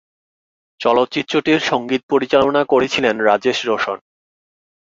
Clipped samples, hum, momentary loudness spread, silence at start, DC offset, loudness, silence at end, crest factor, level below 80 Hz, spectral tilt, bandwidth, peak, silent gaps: under 0.1%; none; 6 LU; 0.8 s; under 0.1%; -17 LUFS; 1 s; 16 dB; -56 dBFS; -4.5 dB/octave; 7.8 kHz; -2 dBFS; 2.03-2.09 s